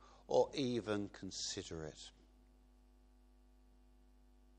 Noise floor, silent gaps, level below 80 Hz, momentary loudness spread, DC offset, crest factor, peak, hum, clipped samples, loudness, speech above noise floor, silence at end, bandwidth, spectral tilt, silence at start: -66 dBFS; none; -66 dBFS; 15 LU; under 0.1%; 24 dB; -20 dBFS; none; under 0.1%; -40 LUFS; 26 dB; 2.5 s; 9.6 kHz; -4.5 dB/octave; 0 s